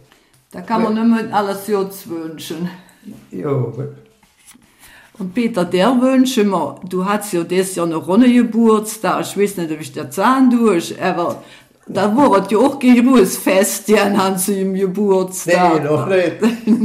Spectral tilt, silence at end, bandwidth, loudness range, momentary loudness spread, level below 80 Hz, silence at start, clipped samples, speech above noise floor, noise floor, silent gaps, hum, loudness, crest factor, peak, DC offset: -5.5 dB/octave; 0 s; 16 kHz; 10 LU; 13 LU; -58 dBFS; 0.55 s; under 0.1%; 37 dB; -52 dBFS; none; none; -15 LUFS; 12 dB; -4 dBFS; under 0.1%